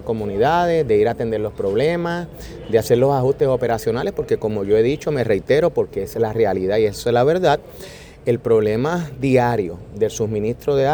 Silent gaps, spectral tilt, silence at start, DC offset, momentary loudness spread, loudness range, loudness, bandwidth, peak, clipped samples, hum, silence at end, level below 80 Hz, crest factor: none; -6.5 dB/octave; 0 s; under 0.1%; 7 LU; 1 LU; -19 LUFS; over 20 kHz; -2 dBFS; under 0.1%; none; 0 s; -44 dBFS; 16 dB